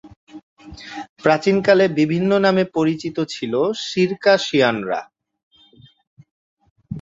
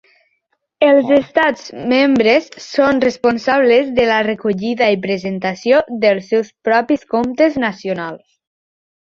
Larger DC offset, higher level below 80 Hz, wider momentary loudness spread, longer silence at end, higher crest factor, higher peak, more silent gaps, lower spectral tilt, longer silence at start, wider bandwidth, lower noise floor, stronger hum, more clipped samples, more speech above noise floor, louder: neither; about the same, -56 dBFS vs -54 dBFS; first, 15 LU vs 8 LU; second, 0 s vs 1 s; about the same, 18 dB vs 14 dB; about the same, -2 dBFS vs -2 dBFS; first, 0.16-0.27 s, 0.43-0.57 s, 1.09-1.16 s, 5.43-5.51 s, 6.07-6.17 s, 6.31-6.57 s, 6.70-6.76 s vs none; about the same, -5.5 dB/octave vs -5.5 dB/octave; second, 0.05 s vs 0.8 s; about the same, 7.8 kHz vs 7.4 kHz; second, -51 dBFS vs -68 dBFS; neither; neither; second, 33 dB vs 53 dB; second, -18 LUFS vs -15 LUFS